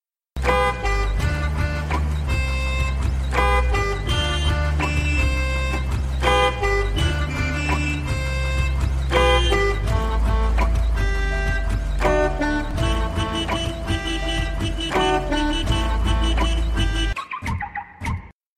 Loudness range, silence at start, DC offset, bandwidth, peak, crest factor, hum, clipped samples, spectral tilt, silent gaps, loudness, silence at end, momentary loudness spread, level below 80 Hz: 2 LU; 0.35 s; under 0.1%; 13.5 kHz; -4 dBFS; 16 dB; none; under 0.1%; -5 dB/octave; none; -22 LUFS; 0.25 s; 6 LU; -24 dBFS